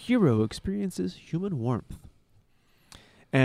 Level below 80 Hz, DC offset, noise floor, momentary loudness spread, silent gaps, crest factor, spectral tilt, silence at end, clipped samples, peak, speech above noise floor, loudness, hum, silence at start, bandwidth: -52 dBFS; under 0.1%; -63 dBFS; 11 LU; none; 20 dB; -7 dB/octave; 0 s; under 0.1%; -8 dBFS; 36 dB; -29 LUFS; none; 0 s; 14 kHz